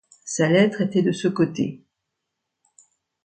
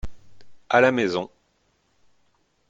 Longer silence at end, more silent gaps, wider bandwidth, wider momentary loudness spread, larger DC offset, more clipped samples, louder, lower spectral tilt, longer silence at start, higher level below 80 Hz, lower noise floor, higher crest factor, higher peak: about the same, 1.45 s vs 1.45 s; neither; first, 9.4 kHz vs 7.8 kHz; second, 10 LU vs 21 LU; neither; neither; about the same, -21 LUFS vs -21 LUFS; about the same, -5.5 dB/octave vs -5.5 dB/octave; first, 0.25 s vs 0.05 s; second, -68 dBFS vs -48 dBFS; first, -81 dBFS vs -67 dBFS; second, 18 dB vs 24 dB; second, -6 dBFS vs -2 dBFS